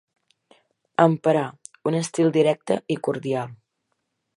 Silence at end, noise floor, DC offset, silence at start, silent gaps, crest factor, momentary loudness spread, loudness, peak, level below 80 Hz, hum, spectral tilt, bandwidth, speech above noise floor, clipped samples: 0.8 s; -76 dBFS; under 0.1%; 1 s; none; 22 dB; 11 LU; -23 LUFS; -2 dBFS; -72 dBFS; none; -6 dB/octave; 11.5 kHz; 55 dB; under 0.1%